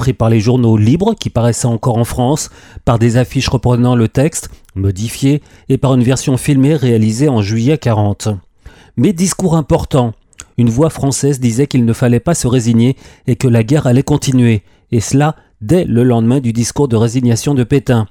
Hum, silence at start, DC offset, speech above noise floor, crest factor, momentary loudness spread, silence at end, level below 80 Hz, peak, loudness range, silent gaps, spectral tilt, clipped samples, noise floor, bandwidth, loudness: none; 0 s; under 0.1%; 28 dB; 12 dB; 7 LU; 0.05 s; -34 dBFS; -2 dBFS; 2 LU; none; -6.5 dB/octave; under 0.1%; -40 dBFS; 15.5 kHz; -13 LUFS